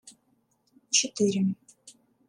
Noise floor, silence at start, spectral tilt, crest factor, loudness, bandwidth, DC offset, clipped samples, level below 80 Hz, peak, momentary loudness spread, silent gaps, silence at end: -70 dBFS; 0.05 s; -3 dB/octave; 24 dB; -26 LUFS; 11 kHz; under 0.1%; under 0.1%; -78 dBFS; -8 dBFS; 8 LU; none; 0.4 s